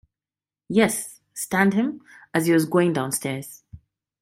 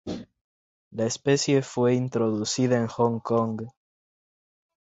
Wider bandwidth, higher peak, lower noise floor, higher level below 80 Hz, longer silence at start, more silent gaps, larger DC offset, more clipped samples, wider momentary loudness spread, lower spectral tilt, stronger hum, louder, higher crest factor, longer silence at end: first, 16 kHz vs 8.2 kHz; first, -4 dBFS vs -8 dBFS; about the same, under -90 dBFS vs under -90 dBFS; about the same, -62 dBFS vs -62 dBFS; first, 0.7 s vs 0.05 s; second, none vs 0.41-0.91 s; neither; neither; about the same, 14 LU vs 14 LU; about the same, -5 dB/octave vs -5.5 dB/octave; neither; about the same, -23 LUFS vs -25 LUFS; about the same, 20 dB vs 18 dB; second, 0.45 s vs 1.15 s